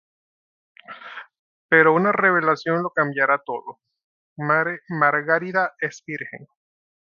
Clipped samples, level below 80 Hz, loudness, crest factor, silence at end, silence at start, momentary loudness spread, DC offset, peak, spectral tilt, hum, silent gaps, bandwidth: under 0.1%; -74 dBFS; -20 LUFS; 22 dB; 0.65 s; 0.9 s; 21 LU; under 0.1%; -2 dBFS; -6.5 dB/octave; none; 1.39-1.69 s, 4.04-4.36 s; 7.2 kHz